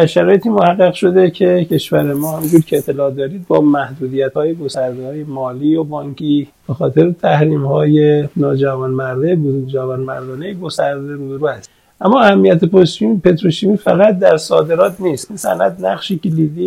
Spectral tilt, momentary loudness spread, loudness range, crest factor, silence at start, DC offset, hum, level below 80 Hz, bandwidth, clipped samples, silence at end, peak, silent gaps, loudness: -7 dB/octave; 11 LU; 6 LU; 14 dB; 0 s; under 0.1%; none; -52 dBFS; 16.5 kHz; 0.2%; 0 s; 0 dBFS; none; -14 LUFS